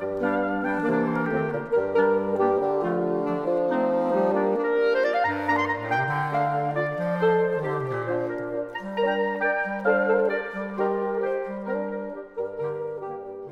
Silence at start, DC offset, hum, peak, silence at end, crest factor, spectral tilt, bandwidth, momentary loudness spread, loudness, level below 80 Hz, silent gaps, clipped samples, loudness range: 0 s; under 0.1%; none; -10 dBFS; 0 s; 16 dB; -8 dB/octave; 7 kHz; 9 LU; -25 LUFS; -62 dBFS; none; under 0.1%; 2 LU